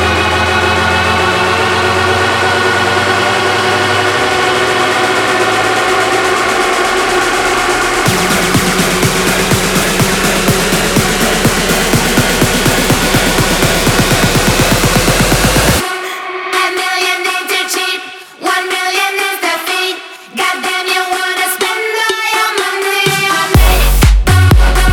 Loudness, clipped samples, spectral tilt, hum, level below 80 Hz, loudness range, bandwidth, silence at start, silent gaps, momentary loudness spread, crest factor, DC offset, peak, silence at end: -11 LUFS; under 0.1%; -3.5 dB/octave; none; -20 dBFS; 4 LU; over 20 kHz; 0 s; none; 4 LU; 12 dB; under 0.1%; 0 dBFS; 0 s